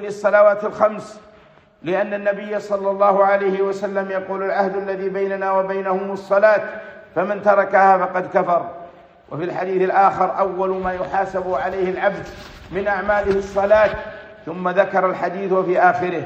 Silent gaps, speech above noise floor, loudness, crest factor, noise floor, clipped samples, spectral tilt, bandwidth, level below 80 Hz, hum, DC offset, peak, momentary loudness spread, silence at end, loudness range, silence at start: none; 31 dB; -19 LUFS; 16 dB; -49 dBFS; under 0.1%; -6.5 dB/octave; 8.2 kHz; -50 dBFS; none; under 0.1%; -2 dBFS; 14 LU; 0 s; 3 LU; 0 s